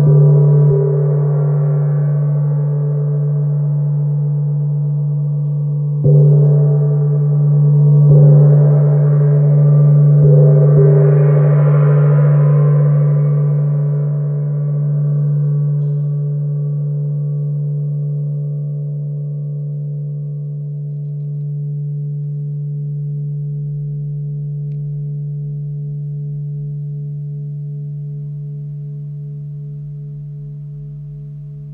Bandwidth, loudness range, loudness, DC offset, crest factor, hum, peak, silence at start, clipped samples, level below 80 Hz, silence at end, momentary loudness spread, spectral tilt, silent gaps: 2.1 kHz; 14 LU; -14 LUFS; under 0.1%; 12 dB; none; -2 dBFS; 0 s; under 0.1%; -50 dBFS; 0 s; 17 LU; -14.5 dB/octave; none